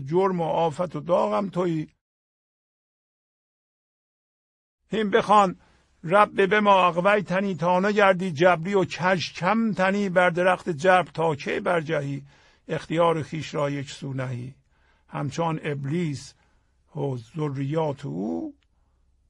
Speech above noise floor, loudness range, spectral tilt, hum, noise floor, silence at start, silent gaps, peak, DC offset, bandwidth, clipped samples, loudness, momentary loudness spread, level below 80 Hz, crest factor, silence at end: 41 dB; 10 LU; -6 dB/octave; none; -64 dBFS; 0 s; 2.01-4.78 s; -4 dBFS; under 0.1%; 11 kHz; under 0.1%; -24 LUFS; 14 LU; -62 dBFS; 22 dB; 0.8 s